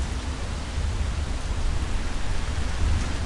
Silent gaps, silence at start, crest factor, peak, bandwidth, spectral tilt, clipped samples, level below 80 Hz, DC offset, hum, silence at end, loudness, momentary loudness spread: none; 0 s; 14 dB; -12 dBFS; 11.5 kHz; -5 dB/octave; under 0.1%; -28 dBFS; under 0.1%; none; 0 s; -30 LUFS; 4 LU